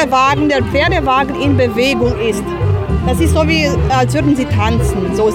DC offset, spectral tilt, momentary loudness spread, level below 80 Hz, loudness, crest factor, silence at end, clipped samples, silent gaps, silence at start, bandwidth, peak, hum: under 0.1%; -6 dB/octave; 4 LU; -24 dBFS; -13 LUFS; 12 dB; 0 s; under 0.1%; none; 0 s; 16.5 kHz; -2 dBFS; none